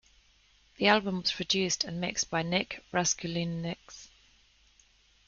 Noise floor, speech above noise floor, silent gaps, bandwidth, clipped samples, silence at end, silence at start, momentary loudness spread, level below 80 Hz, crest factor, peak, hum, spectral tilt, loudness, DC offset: -64 dBFS; 34 dB; none; 10 kHz; under 0.1%; 1.2 s; 0.8 s; 13 LU; -62 dBFS; 24 dB; -8 dBFS; none; -3 dB/octave; -29 LUFS; under 0.1%